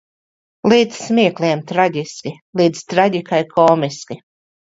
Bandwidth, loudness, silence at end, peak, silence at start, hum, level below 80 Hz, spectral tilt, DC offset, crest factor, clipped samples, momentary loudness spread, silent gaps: 8 kHz; -16 LUFS; 0.6 s; 0 dBFS; 0.65 s; none; -62 dBFS; -5.5 dB/octave; under 0.1%; 18 dB; under 0.1%; 14 LU; 2.41-2.53 s